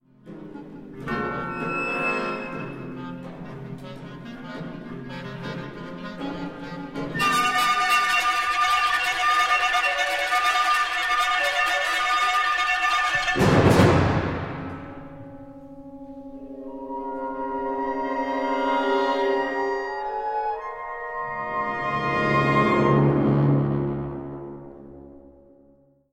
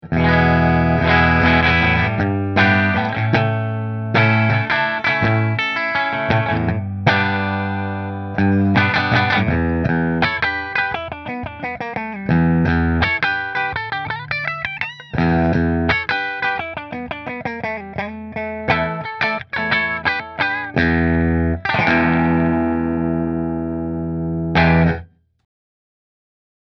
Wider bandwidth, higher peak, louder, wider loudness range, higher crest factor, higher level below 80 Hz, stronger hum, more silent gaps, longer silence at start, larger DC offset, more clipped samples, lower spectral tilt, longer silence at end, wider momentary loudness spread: first, 16 kHz vs 6.2 kHz; second, -4 dBFS vs 0 dBFS; second, -22 LUFS vs -18 LUFS; first, 14 LU vs 5 LU; about the same, 20 dB vs 18 dB; second, -48 dBFS vs -34 dBFS; neither; neither; first, 0.25 s vs 0.05 s; neither; neither; second, -5 dB/octave vs -8 dB/octave; second, 0.8 s vs 1.75 s; first, 20 LU vs 11 LU